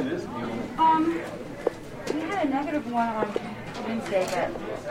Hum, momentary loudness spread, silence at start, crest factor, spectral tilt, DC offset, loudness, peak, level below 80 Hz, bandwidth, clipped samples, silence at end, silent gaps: none; 11 LU; 0 s; 18 dB; -5.5 dB/octave; under 0.1%; -28 LUFS; -8 dBFS; -54 dBFS; 16 kHz; under 0.1%; 0 s; none